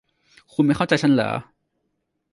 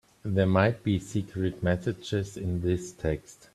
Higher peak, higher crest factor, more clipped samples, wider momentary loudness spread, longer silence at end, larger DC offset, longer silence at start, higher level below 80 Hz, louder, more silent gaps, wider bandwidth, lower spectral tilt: about the same, -6 dBFS vs -8 dBFS; about the same, 18 dB vs 20 dB; neither; first, 12 LU vs 8 LU; first, 0.9 s vs 0.2 s; neither; first, 0.6 s vs 0.25 s; second, -56 dBFS vs -50 dBFS; first, -21 LUFS vs -29 LUFS; neither; about the same, 11.5 kHz vs 12.5 kHz; about the same, -6.5 dB/octave vs -7 dB/octave